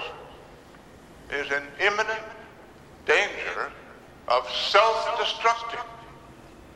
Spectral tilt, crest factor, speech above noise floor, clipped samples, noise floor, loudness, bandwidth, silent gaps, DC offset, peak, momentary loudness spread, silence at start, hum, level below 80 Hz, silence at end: -2 dB/octave; 24 dB; 24 dB; under 0.1%; -49 dBFS; -25 LUFS; 13.5 kHz; none; under 0.1%; -4 dBFS; 23 LU; 0 s; none; -58 dBFS; 0 s